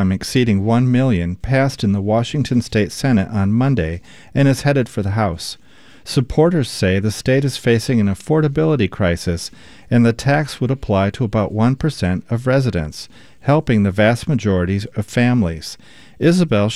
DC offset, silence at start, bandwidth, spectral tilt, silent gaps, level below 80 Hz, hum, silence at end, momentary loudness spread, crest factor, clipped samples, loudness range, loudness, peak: 0.7%; 0 s; 13.5 kHz; -6.5 dB/octave; none; -40 dBFS; none; 0 s; 9 LU; 16 dB; under 0.1%; 2 LU; -17 LUFS; -2 dBFS